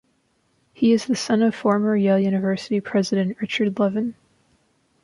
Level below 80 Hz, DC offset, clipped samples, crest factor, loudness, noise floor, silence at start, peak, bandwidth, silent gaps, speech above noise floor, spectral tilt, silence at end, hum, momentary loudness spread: -66 dBFS; under 0.1%; under 0.1%; 16 dB; -21 LUFS; -66 dBFS; 0.8 s; -6 dBFS; 11.5 kHz; none; 46 dB; -6 dB/octave; 0.9 s; none; 5 LU